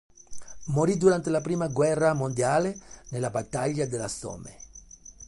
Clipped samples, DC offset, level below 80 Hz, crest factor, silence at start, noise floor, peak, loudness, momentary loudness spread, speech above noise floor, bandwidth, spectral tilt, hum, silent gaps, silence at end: under 0.1%; under 0.1%; -54 dBFS; 18 dB; 0.3 s; -49 dBFS; -8 dBFS; -26 LUFS; 23 LU; 22 dB; 11.5 kHz; -6 dB/octave; none; none; 0.05 s